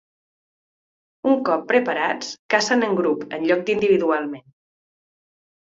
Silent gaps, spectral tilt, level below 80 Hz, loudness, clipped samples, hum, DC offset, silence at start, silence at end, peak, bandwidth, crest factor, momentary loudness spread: 2.39-2.49 s; -4 dB/octave; -66 dBFS; -21 LUFS; under 0.1%; none; under 0.1%; 1.25 s; 1.3 s; -2 dBFS; 8 kHz; 20 dB; 8 LU